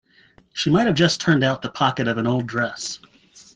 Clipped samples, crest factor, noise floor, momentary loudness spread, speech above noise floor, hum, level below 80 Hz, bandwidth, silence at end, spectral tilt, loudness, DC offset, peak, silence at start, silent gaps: under 0.1%; 20 dB; -55 dBFS; 13 LU; 35 dB; none; -54 dBFS; 9.8 kHz; 0.6 s; -5 dB/octave; -21 LUFS; under 0.1%; -2 dBFS; 0.55 s; none